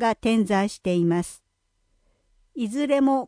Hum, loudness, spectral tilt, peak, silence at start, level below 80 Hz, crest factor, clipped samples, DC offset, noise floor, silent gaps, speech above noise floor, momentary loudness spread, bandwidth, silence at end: none; -23 LUFS; -6 dB/octave; -10 dBFS; 0 s; -56 dBFS; 14 dB; under 0.1%; under 0.1%; -71 dBFS; none; 49 dB; 11 LU; 10.5 kHz; 0 s